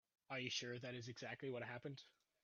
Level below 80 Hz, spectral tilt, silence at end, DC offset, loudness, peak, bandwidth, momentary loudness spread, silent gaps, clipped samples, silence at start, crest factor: -88 dBFS; -3 dB/octave; 0.35 s; under 0.1%; -49 LUFS; -30 dBFS; 7.2 kHz; 10 LU; none; under 0.1%; 0.3 s; 22 dB